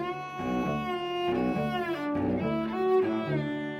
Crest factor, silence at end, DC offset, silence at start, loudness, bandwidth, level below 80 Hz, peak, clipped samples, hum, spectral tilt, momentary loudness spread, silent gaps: 14 dB; 0 s; under 0.1%; 0 s; -29 LUFS; 14.5 kHz; -54 dBFS; -16 dBFS; under 0.1%; none; -7.5 dB/octave; 5 LU; none